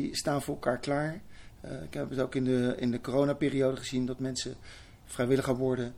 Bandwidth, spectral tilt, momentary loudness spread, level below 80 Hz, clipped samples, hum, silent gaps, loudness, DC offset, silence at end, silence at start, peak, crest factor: 16 kHz; -5.5 dB/octave; 15 LU; -54 dBFS; under 0.1%; none; none; -31 LUFS; under 0.1%; 0 s; 0 s; -14 dBFS; 16 dB